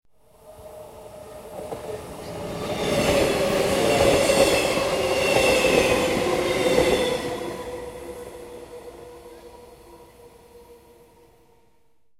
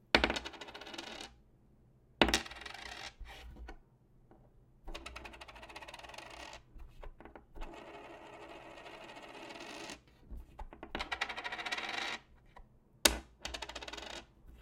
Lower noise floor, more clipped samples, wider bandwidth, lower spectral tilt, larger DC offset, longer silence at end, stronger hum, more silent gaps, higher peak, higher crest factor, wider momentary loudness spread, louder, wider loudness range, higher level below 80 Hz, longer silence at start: about the same, -67 dBFS vs -65 dBFS; neither; about the same, 16 kHz vs 16.5 kHz; first, -3.5 dB/octave vs -2 dB/octave; neither; first, 1.45 s vs 0 s; neither; neither; about the same, -4 dBFS vs -4 dBFS; second, 20 dB vs 38 dB; about the same, 23 LU vs 24 LU; first, -21 LUFS vs -38 LUFS; first, 17 LU vs 14 LU; first, -44 dBFS vs -54 dBFS; first, 0.45 s vs 0.15 s